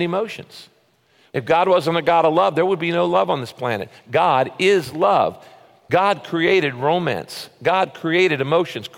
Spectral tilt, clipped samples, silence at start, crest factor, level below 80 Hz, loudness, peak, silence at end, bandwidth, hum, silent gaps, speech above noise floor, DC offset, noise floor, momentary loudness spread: -5.5 dB/octave; under 0.1%; 0 s; 14 dB; -62 dBFS; -19 LUFS; -4 dBFS; 0.1 s; 16.5 kHz; none; none; 40 dB; under 0.1%; -58 dBFS; 9 LU